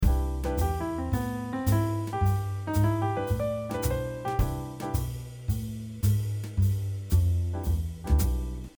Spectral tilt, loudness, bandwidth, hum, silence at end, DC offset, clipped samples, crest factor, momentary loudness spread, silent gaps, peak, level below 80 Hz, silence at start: -7 dB/octave; -29 LUFS; over 20 kHz; none; 0.1 s; under 0.1%; under 0.1%; 16 dB; 6 LU; none; -12 dBFS; -32 dBFS; 0 s